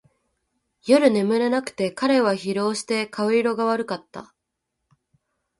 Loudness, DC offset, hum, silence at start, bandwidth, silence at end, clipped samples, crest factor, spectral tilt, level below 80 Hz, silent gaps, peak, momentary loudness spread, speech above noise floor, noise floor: -22 LUFS; under 0.1%; none; 0.85 s; 11.5 kHz; 1.35 s; under 0.1%; 20 dB; -5 dB/octave; -68 dBFS; none; -4 dBFS; 14 LU; 59 dB; -80 dBFS